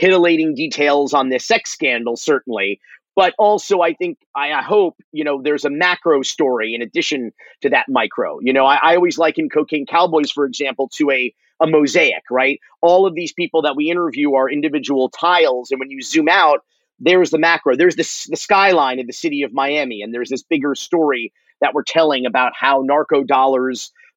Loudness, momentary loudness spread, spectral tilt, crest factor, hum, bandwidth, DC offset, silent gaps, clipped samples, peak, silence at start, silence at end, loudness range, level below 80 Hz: -16 LUFS; 9 LU; -3.5 dB/octave; 16 dB; none; 8.2 kHz; under 0.1%; 4.26-4.34 s, 5.04-5.12 s; under 0.1%; 0 dBFS; 0 s; 0.3 s; 3 LU; -68 dBFS